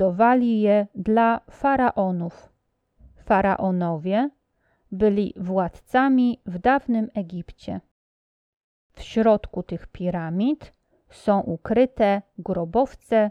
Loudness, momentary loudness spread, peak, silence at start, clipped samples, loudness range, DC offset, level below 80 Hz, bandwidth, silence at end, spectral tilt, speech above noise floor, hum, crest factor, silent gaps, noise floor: -22 LUFS; 13 LU; -6 dBFS; 0 s; under 0.1%; 4 LU; under 0.1%; -50 dBFS; 10 kHz; 0 s; -8.5 dB/octave; 47 dB; none; 16 dB; 7.91-8.90 s; -69 dBFS